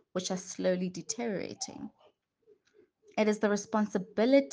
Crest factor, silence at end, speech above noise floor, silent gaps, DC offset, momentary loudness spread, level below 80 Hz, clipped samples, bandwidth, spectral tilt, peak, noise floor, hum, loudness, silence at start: 20 dB; 0 s; 37 dB; none; under 0.1%; 12 LU; -76 dBFS; under 0.1%; 10 kHz; -5 dB/octave; -12 dBFS; -67 dBFS; none; -32 LUFS; 0.15 s